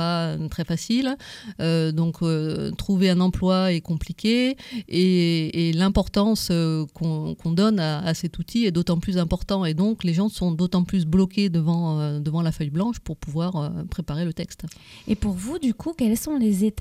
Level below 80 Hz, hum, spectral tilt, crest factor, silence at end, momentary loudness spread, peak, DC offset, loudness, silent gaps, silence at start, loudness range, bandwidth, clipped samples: -42 dBFS; none; -6.5 dB/octave; 16 dB; 0 s; 8 LU; -8 dBFS; under 0.1%; -23 LUFS; none; 0 s; 5 LU; 15 kHz; under 0.1%